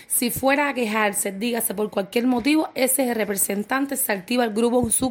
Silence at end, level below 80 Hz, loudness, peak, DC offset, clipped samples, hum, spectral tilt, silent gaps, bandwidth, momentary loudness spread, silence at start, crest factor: 0 s; -56 dBFS; -22 LUFS; -4 dBFS; under 0.1%; under 0.1%; none; -3 dB/octave; none; 17 kHz; 4 LU; 0 s; 18 dB